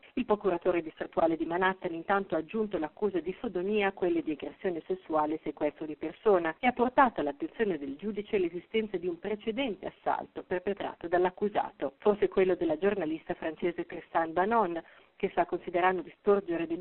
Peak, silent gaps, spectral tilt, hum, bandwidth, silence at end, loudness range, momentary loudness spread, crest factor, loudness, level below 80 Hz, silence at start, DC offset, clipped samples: -10 dBFS; none; -4 dB/octave; none; 4.2 kHz; 0 s; 3 LU; 8 LU; 20 dB; -31 LUFS; -62 dBFS; 0.15 s; under 0.1%; under 0.1%